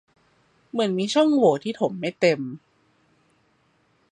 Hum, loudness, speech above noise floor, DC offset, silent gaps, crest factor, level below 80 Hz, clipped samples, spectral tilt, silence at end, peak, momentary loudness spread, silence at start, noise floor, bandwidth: none; -22 LUFS; 43 dB; under 0.1%; none; 20 dB; -74 dBFS; under 0.1%; -5.5 dB/octave; 1.55 s; -6 dBFS; 13 LU; 0.75 s; -65 dBFS; 10.5 kHz